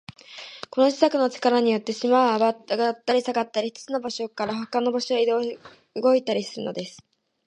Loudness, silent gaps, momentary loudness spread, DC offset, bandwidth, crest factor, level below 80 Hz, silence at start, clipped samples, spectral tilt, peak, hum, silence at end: -23 LUFS; none; 15 LU; under 0.1%; 9.8 kHz; 20 dB; -72 dBFS; 0.3 s; under 0.1%; -4.5 dB/octave; -4 dBFS; none; 0.5 s